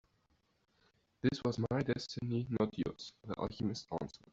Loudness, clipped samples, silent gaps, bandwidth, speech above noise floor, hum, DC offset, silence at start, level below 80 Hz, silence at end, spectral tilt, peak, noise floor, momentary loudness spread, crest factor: -38 LUFS; under 0.1%; none; 7.8 kHz; 39 dB; none; under 0.1%; 1.25 s; -64 dBFS; 0.2 s; -6.5 dB/octave; -18 dBFS; -76 dBFS; 8 LU; 20 dB